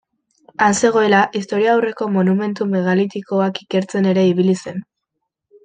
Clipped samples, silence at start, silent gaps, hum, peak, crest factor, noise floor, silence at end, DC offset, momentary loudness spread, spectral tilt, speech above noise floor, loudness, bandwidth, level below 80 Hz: under 0.1%; 0.6 s; none; none; -2 dBFS; 16 dB; -77 dBFS; 0.8 s; under 0.1%; 7 LU; -5.5 dB/octave; 61 dB; -17 LUFS; 9.4 kHz; -62 dBFS